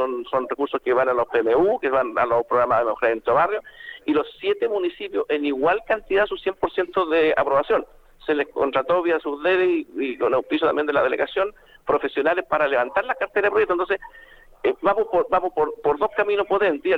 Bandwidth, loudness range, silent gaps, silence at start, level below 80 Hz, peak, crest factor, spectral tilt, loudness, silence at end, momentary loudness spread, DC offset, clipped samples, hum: 5.6 kHz; 2 LU; none; 0 s; -54 dBFS; -6 dBFS; 16 dB; -6.5 dB/octave; -22 LUFS; 0 s; 6 LU; under 0.1%; under 0.1%; none